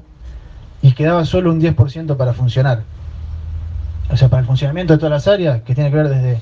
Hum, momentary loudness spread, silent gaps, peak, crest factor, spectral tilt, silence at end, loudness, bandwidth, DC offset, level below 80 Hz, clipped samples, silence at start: none; 14 LU; none; 0 dBFS; 14 dB; -8.5 dB/octave; 0 s; -15 LUFS; 7 kHz; under 0.1%; -32 dBFS; under 0.1%; 0.1 s